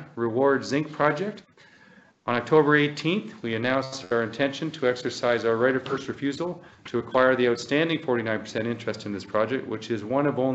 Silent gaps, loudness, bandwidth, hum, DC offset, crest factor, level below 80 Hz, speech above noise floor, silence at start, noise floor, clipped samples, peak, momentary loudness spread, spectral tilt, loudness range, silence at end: none; -25 LUFS; 8.2 kHz; none; under 0.1%; 20 dB; -68 dBFS; 30 dB; 0 s; -55 dBFS; under 0.1%; -6 dBFS; 11 LU; -5.5 dB/octave; 2 LU; 0 s